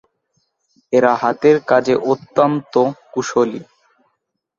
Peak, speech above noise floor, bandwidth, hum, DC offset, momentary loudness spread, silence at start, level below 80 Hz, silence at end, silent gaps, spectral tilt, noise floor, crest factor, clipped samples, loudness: -2 dBFS; 56 dB; 7.6 kHz; none; under 0.1%; 6 LU; 0.9 s; -62 dBFS; 0.95 s; none; -6 dB/octave; -72 dBFS; 16 dB; under 0.1%; -16 LUFS